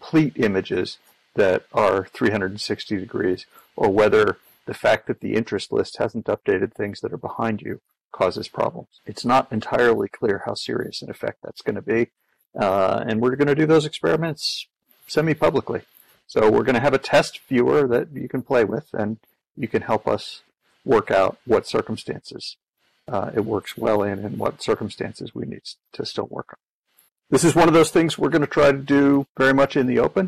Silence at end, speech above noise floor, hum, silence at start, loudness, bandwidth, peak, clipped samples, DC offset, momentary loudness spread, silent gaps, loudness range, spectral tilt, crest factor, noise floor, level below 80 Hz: 0 s; 42 dB; none; 0 s; -21 LUFS; 14.5 kHz; -8 dBFS; under 0.1%; under 0.1%; 15 LU; 8.01-8.11 s, 22.69-22.73 s, 26.63-26.84 s, 29.29-29.35 s; 6 LU; -5.5 dB/octave; 14 dB; -63 dBFS; -54 dBFS